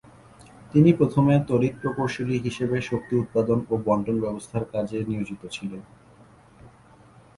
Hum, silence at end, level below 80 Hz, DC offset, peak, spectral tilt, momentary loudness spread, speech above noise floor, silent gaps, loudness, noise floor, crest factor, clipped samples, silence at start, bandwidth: none; 0.7 s; -54 dBFS; under 0.1%; -6 dBFS; -8 dB/octave; 13 LU; 29 dB; none; -24 LUFS; -52 dBFS; 20 dB; under 0.1%; 0.6 s; 11.5 kHz